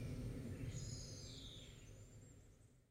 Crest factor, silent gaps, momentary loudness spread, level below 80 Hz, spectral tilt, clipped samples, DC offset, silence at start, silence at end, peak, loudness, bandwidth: 14 dB; none; 16 LU; -60 dBFS; -5 dB/octave; under 0.1%; under 0.1%; 0 s; 0.05 s; -36 dBFS; -52 LUFS; 16 kHz